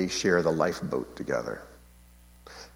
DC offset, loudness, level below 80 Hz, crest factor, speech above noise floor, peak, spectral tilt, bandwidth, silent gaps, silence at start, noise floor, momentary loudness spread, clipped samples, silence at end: under 0.1%; -28 LUFS; -56 dBFS; 22 dB; 26 dB; -8 dBFS; -4.5 dB/octave; 17 kHz; none; 0 s; -54 dBFS; 19 LU; under 0.1%; 0.1 s